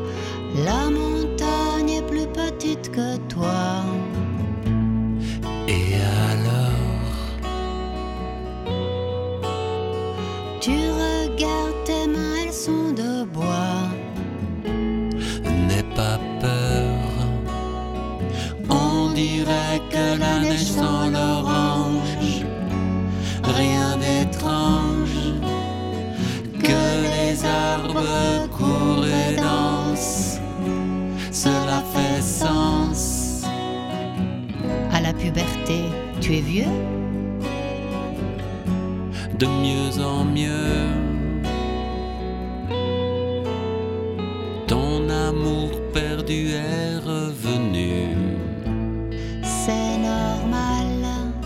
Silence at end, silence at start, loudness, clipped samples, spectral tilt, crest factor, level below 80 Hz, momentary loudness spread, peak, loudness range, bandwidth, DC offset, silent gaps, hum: 0 s; 0 s; -23 LUFS; under 0.1%; -5.5 dB/octave; 18 dB; -34 dBFS; 7 LU; -4 dBFS; 4 LU; 16.5 kHz; under 0.1%; none; none